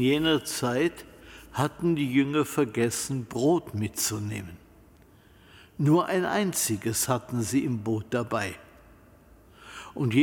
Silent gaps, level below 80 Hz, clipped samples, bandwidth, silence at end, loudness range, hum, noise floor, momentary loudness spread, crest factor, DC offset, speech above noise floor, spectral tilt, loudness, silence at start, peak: none; -58 dBFS; under 0.1%; 17.5 kHz; 0 s; 3 LU; none; -55 dBFS; 17 LU; 18 dB; under 0.1%; 29 dB; -4.5 dB/octave; -27 LUFS; 0 s; -10 dBFS